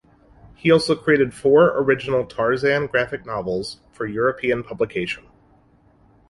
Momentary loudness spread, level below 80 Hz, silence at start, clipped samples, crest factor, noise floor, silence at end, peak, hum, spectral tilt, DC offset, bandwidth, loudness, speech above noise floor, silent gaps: 12 LU; -52 dBFS; 0.65 s; under 0.1%; 18 dB; -56 dBFS; 1.1 s; -4 dBFS; none; -6 dB/octave; under 0.1%; 11.5 kHz; -20 LUFS; 36 dB; none